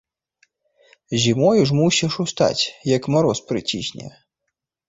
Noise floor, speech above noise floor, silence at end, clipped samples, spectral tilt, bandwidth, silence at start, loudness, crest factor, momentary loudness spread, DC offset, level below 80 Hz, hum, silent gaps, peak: -79 dBFS; 60 dB; 0.8 s; under 0.1%; -5 dB/octave; 8 kHz; 1.1 s; -19 LUFS; 18 dB; 11 LU; under 0.1%; -54 dBFS; none; none; -4 dBFS